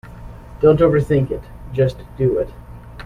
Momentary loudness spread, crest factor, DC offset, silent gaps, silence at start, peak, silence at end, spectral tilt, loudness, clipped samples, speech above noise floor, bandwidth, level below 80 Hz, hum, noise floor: 24 LU; 16 dB; under 0.1%; none; 0.05 s; -2 dBFS; 0.05 s; -9 dB/octave; -18 LUFS; under 0.1%; 19 dB; 11 kHz; -36 dBFS; none; -36 dBFS